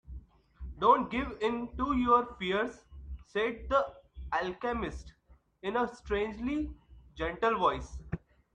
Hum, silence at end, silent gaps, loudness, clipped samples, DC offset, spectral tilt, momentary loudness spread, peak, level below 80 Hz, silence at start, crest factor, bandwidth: none; 0.35 s; none; -32 LUFS; under 0.1%; under 0.1%; -6 dB/octave; 22 LU; -10 dBFS; -48 dBFS; 0.1 s; 22 dB; 9.6 kHz